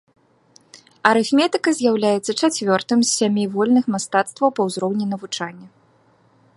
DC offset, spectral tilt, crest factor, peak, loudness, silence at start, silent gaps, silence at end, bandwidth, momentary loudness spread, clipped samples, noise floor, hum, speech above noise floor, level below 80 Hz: under 0.1%; -4 dB/octave; 20 dB; 0 dBFS; -19 LUFS; 0.75 s; none; 0.9 s; 11.5 kHz; 8 LU; under 0.1%; -57 dBFS; none; 38 dB; -68 dBFS